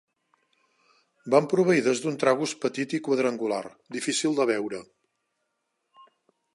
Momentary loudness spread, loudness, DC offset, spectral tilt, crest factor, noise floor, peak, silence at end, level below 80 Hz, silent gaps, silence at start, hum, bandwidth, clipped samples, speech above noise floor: 11 LU; -25 LUFS; under 0.1%; -4.5 dB/octave; 22 dB; -78 dBFS; -6 dBFS; 1.7 s; -78 dBFS; none; 1.25 s; none; 11.5 kHz; under 0.1%; 53 dB